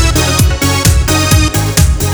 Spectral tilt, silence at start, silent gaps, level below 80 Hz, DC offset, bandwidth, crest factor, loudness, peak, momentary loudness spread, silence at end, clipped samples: -4 dB/octave; 0 s; none; -14 dBFS; under 0.1%; over 20 kHz; 10 dB; -10 LUFS; 0 dBFS; 1 LU; 0 s; under 0.1%